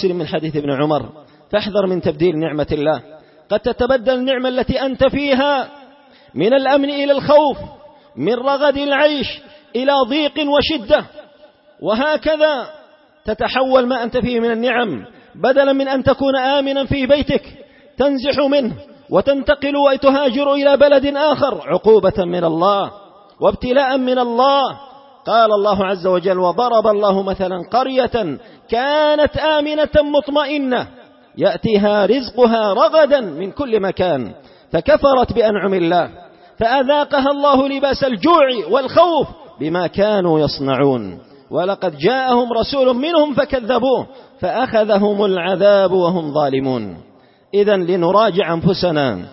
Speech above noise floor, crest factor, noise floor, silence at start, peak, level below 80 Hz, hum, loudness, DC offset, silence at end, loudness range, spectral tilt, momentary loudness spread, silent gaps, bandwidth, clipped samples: 32 dB; 14 dB; -47 dBFS; 0 s; -2 dBFS; -42 dBFS; none; -16 LUFS; under 0.1%; 0 s; 3 LU; -9.5 dB/octave; 9 LU; none; 5.8 kHz; under 0.1%